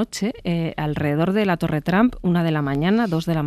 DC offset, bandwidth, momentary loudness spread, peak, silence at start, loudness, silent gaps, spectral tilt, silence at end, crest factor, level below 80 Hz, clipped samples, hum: under 0.1%; 14 kHz; 5 LU; -6 dBFS; 0 s; -21 LUFS; none; -7 dB/octave; 0 s; 16 dB; -44 dBFS; under 0.1%; none